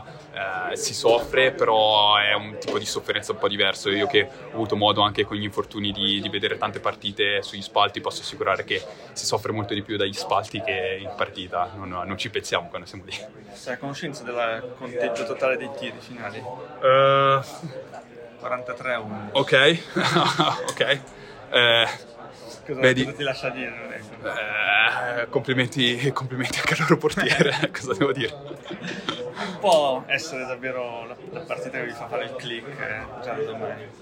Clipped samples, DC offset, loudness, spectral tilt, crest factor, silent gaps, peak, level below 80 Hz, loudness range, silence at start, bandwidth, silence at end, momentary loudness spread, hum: under 0.1%; under 0.1%; -23 LUFS; -4 dB/octave; 22 dB; none; -2 dBFS; -58 dBFS; 8 LU; 0 s; 16 kHz; 0 s; 16 LU; none